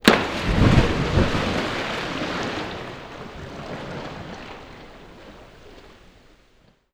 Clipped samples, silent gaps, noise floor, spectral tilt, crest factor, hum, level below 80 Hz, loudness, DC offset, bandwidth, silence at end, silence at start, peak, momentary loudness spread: under 0.1%; none; -58 dBFS; -5.5 dB/octave; 24 dB; none; -34 dBFS; -23 LUFS; under 0.1%; over 20 kHz; 1 s; 0.05 s; 0 dBFS; 26 LU